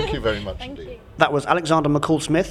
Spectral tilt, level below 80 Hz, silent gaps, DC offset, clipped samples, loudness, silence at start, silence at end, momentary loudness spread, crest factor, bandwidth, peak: -5.5 dB/octave; -40 dBFS; none; under 0.1%; under 0.1%; -20 LUFS; 0 s; 0 s; 16 LU; 18 dB; 13 kHz; -2 dBFS